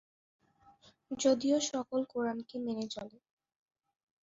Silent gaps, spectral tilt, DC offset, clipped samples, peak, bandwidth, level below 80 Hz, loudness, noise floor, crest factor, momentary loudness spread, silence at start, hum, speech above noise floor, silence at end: none; -3.5 dB/octave; under 0.1%; under 0.1%; -16 dBFS; 8 kHz; -76 dBFS; -34 LUFS; -64 dBFS; 20 dB; 14 LU; 1.1 s; none; 30 dB; 1.15 s